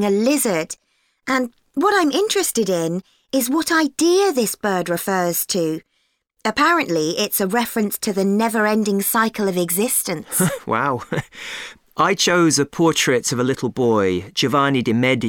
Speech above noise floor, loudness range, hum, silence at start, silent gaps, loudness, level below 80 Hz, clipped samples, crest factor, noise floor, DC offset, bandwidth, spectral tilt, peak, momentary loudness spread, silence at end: 49 dB; 2 LU; none; 0 s; none; -19 LUFS; -58 dBFS; under 0.1%; 16 dB; -68 dBFS; under 0.1%; over 20 kHz; -4 dB/octave; -4 dBFS; 9 LU; 0 s